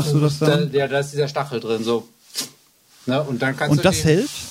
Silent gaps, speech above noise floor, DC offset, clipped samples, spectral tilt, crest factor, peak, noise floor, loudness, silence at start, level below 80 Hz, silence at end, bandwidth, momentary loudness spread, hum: none; 34 dB; under 0.1%; under 0.1%; -5.5 dB/octave; 18 dB; -2 dBFS; -54 dBFS; -20 LUFS; 0 s; -52 dBFS; 0 s; 16 kHz; 11 LU; none